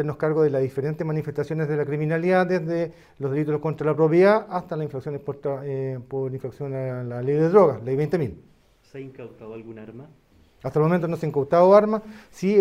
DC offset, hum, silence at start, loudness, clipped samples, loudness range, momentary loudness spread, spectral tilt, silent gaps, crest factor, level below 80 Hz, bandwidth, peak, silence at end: under 0.1%; none; 0 s; -23 LUFS; under 0.1%; 6 LU; 21 LU; -8.5 dB/octave; none; 20 dB; -60 dBFS; 12.5 kHz; -2 dBFS; 0 s